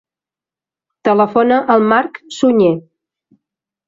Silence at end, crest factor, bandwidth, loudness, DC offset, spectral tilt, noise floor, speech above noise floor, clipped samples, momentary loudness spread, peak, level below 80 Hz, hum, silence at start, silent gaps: 1.05 s; 14 dB; 7.8 kHz; -13 LUFS; under 0.1%; -6.5 dB/octave; -89 dBFS; 76 dB; under 0.1%; 9 LU; -2 dBFS; -60 dBFS; none; 1.05 s; none